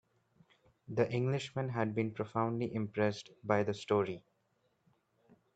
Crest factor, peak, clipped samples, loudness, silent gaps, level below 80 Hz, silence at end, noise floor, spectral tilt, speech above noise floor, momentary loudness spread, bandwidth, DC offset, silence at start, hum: 22 dB; -14 dBFS; under 0.1%; -35 LUFS; none; -74 dBFS; 1.35 s; -77 dBFS; -7 dB/octave; 43 dB; 6 LU; 8.8 kHz; under 0.1%; 0.9 s; none